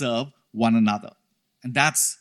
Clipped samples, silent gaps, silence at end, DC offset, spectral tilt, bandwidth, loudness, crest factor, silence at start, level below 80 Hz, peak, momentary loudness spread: under 0.1%; none; 0.05 s; under 0.1%; -3.5 dB/octave; 15 kHz; -22 LUFS; 22 dB; 0 s; -70 dBFS; -2 dBFS; 13 LU